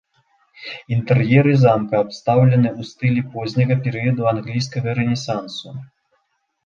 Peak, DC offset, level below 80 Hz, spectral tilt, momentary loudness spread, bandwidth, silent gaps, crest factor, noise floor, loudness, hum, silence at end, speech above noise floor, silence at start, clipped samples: -2 dBFS; under 0.1%; -54 dBFS; -7.5 dB/octave; 17 LU; 7.2 kHz; none; 16 dB; -69 dBFS; -18 LUFS; none; 0.8 s; 51 dB; 0.6 s; under 0.1%